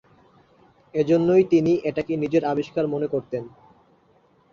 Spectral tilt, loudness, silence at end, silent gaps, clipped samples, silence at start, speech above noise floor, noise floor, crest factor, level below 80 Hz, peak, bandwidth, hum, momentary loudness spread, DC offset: -8 dB/octave; -22 LUFS; 1.05 s; none; under 0.1%; 0.95 s; 38 dB; -60 dBFS; 18 dB; -60 dBFS; -6 dBFS; 7.2 kHz; none; 13 LU; under 0.1%